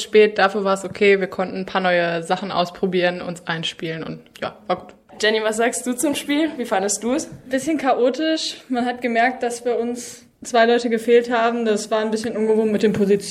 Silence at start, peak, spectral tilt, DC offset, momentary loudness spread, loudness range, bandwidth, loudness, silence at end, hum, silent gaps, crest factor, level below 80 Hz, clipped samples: 0 s; -2 dBFS; -4 dB/octave; under 0.1%; 10 LU; 4 LU; 15 kHz; -20 LUFS; 0 s; none; none; 18 dB; -60 dBFS; under 0.1%